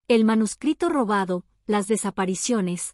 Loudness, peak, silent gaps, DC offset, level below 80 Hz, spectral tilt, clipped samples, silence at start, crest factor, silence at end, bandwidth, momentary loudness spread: -23 LUFS; -8 dBFS; none; under 0.1%; -60 dBFS; -5 dB/octave; under 0.1%; 0.1 s; 14 dB; 0.05 s; 13.5 kHz; 6 LU